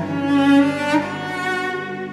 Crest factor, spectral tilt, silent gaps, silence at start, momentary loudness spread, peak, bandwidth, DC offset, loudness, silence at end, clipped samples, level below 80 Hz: 16 dB; -5.5 dB/octave; none; 0 s; 10 LU; -4 dBFS; 12 kHz; under 0.1%; -19 LUFS; 0 s; under 0.1%; -62 dBFS